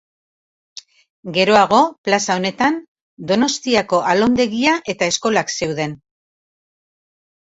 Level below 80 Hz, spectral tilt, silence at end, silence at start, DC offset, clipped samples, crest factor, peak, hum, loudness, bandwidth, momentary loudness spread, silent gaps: -56 dBFS; -3.5 dB/octave; 1.6 s; 1.25 s; under 0.1%; under 0.1%; 18 dB; 0 dBFS; none; -17 LUFS; 8.2 kHz; 10 LU; 1.98-2.04 s, 2.88-2.96 s, 3.02-3.17 s